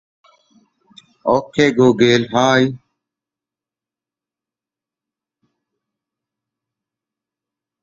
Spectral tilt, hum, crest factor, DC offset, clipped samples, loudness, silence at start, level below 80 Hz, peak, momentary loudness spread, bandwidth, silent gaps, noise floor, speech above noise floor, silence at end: -5.5 dB/octave; none; 20 dB; under 0.1%; under 0.1%; -15 LUFS; 1.25 s; -58 dBFS; 0 dBFS; 9 LU; 7.8 kHz; none; -89 dBFS; 75 dB; 5.05 s